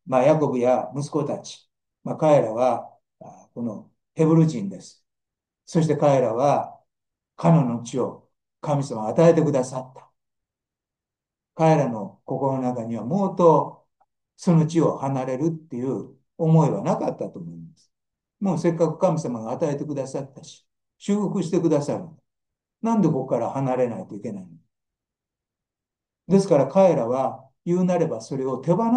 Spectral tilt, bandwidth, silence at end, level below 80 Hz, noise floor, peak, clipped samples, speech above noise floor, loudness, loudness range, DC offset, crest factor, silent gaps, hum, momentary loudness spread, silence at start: -8 dB/octave; 9.6 kHz; 0 s; -68 dBFS; -88 dBFS; -4 dBFS; under 0.1%; 67 dB; -22 LUFS; 4 LU; under 0.1%; 18 dB; none; none; 16 LU; 0.05 s